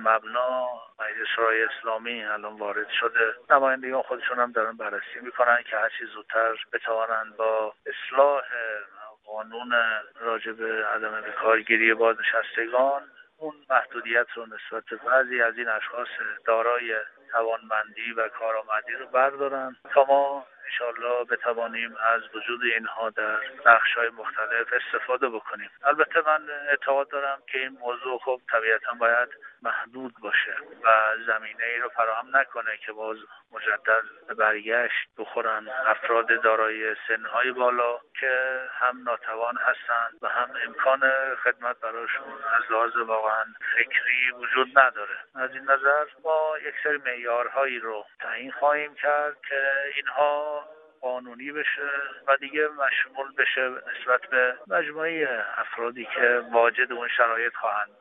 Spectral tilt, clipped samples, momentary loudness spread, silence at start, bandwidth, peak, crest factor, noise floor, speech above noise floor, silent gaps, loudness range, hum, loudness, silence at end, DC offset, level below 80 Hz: 1.5 dB/octave; under 0.1%; 11 LU; 0 s; 3.9 kHz; -4 dBFS; 22 dB; -45 dBFS; 19 dB; none; 3 LU; none; -25 LUFS; 0.15 s; under 0.1%; -80 dBFS